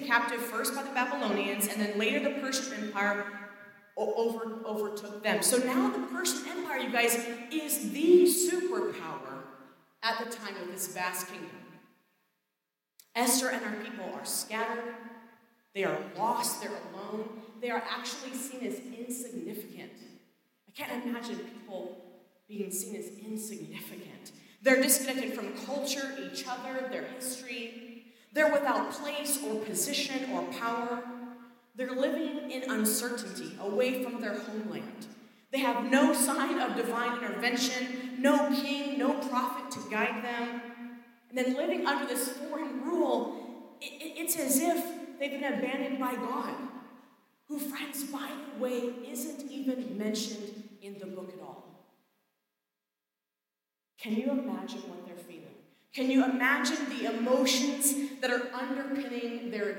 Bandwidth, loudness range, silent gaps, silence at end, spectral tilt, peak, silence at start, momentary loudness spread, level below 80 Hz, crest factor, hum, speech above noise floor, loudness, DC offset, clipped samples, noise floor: 17 kHz; 11 LU; none; 0 s; -2.5 dB/octave; -10 dBFS; 0 s; 17 LU; under -90 dBFS; 24 dB; none; over 58 dB; -31 LUFS; under 0.1%; under 0.1%; under -90 dBFS